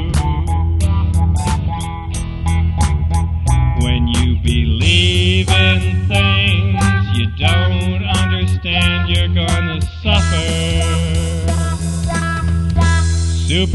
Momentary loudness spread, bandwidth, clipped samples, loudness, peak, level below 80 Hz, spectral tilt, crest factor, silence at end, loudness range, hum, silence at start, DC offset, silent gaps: 6 LU; 12 kHz; under 0.1%; -15 LUFS; 0 dBFS; -20 dBFS; -5 dB/octave; 14 dB; 0 s; 4 LU; none; 0 s; under 0.1%; none